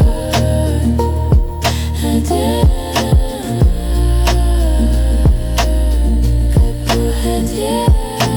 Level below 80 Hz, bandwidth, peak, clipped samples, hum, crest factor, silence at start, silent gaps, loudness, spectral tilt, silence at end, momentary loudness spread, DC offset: -14 dBFS; over 20 kHz; -2 dBFS; under 0.1%; none; 10 dB; 0 s; none; -15 LUFS; -6 dB/octave; 0 s; 3 LU; under 0.1%